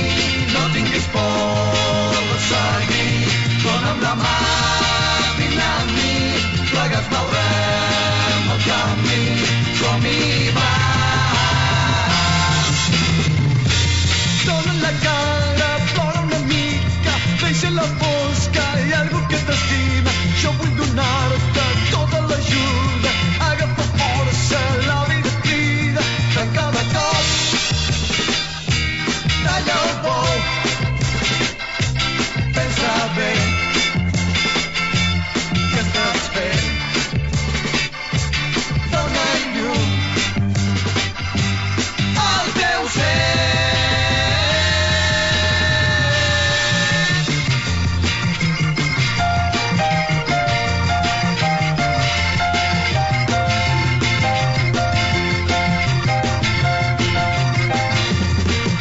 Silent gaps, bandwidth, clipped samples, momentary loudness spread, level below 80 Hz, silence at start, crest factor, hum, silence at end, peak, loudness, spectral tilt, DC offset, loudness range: none; 8 kHz; under 0.1%; 3 LU; -32 dBFS; 0 s; 14 dB; none; 0 s; -2 dBFS; -17 LUFS; -4 dB/octave; under 0.1%; 3 LU